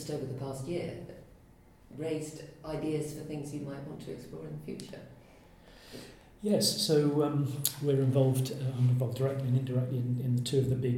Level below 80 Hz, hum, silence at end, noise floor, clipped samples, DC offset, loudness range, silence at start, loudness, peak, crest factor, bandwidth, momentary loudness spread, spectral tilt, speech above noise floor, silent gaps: -62 dBFS; none; 0 s; -58 dBFS; under 0.1%; under 0.1%; 11 LU; 0 s; -31 LUFS; -8 dBFS; 24 dB; 19 kHz; 19 LU; -6 dB/octave; 27 dB; none